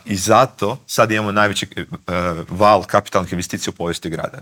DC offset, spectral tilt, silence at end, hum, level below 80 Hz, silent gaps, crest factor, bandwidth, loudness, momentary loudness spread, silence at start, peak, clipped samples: under 0.1%; -4.5 dB/octave; 0 s; none; -48 dBFS; none; 18 dB; 17.5 kHz; -18 LUFS; 10 LU; 0.05 s; 0 dBFS; under 0.1%